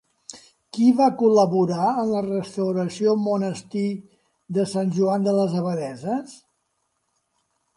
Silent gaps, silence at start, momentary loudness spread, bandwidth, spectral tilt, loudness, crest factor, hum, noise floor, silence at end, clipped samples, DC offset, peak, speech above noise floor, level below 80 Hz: none; 0.3 s; 13 LU; 11.5 kHz; -7 dB/octave; -22 LUFS; 18 dB; none; -73 dBFS; 1.4 s; under 0.1%; under 0.1%; -6 dBFS; 52 dB; -68 dBFS